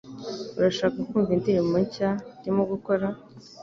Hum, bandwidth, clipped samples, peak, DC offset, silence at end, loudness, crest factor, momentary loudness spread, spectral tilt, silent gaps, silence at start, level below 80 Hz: none; 7.6 kHz; under 0.1%; -10 dBFS; under 0.1%; 0 s; -26 LUFS; 16 dB; 11 LU; -7 dB/octave; none; 0.05 s; -58 dBFS